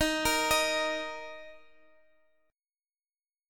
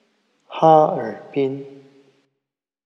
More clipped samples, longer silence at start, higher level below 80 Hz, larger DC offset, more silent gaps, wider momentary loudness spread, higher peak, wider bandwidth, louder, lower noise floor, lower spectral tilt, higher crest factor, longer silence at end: neither; second, 0 s vs 0.5 s; first, -54 dBFS vs -82 dBFS; neither; neither; about the same, 18 LU vs 18 LU; second, -12 dBFS vs 0 dBFS; first, 17.5 kHz vs 6.6 kHz; second, -28 LUFS vs -18 LUFS; first, under -90 dBFS vs -82 dBFS; second, -1.5 dB/octave vs -8 dB/octave; about the same, 20 dB vs 20 dB; first, 1.9 s vs 1.1 s